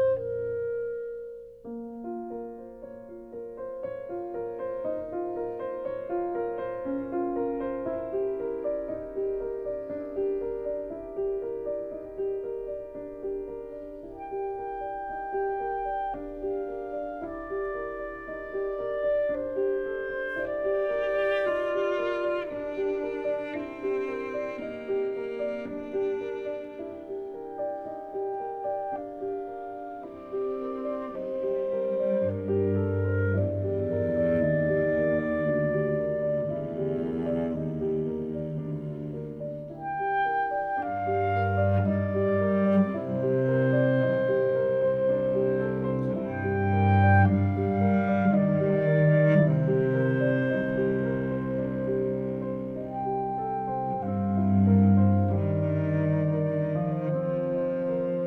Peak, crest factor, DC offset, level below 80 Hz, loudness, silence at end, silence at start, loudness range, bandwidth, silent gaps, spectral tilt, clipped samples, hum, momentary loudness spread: -10 dBFS; 18 dB; under 0.1%; -56 dBFS; -28 LUFS; 0 s; 0 s; 10 LU; 4.5 kHz; none; -10.5 dB/octave; under 0.1%; none; 13 LU